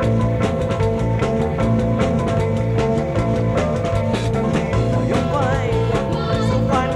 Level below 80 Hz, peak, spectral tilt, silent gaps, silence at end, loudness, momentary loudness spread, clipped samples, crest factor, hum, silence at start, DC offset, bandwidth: -30 dBFS; -6 dBFS; -7.5 dB/octave; none; 0 s; -19 LUFS; 2 LU; under 0.1%; 12 dB; none; 0 s; under 0.1%; 11.5 kHz